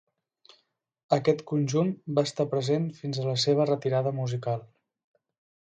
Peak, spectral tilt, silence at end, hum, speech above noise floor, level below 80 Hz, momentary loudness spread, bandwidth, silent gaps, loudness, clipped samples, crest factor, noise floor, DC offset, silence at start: -8 dBFS; -6 dB/octave; 0.95 s; none; 44 dB; -70 dBFS; 7 LU; 9.2 kHz; none; -27 LUFS; under 0.1%; 20 dB; -70 dBFS; under 0.1%; 1.1 s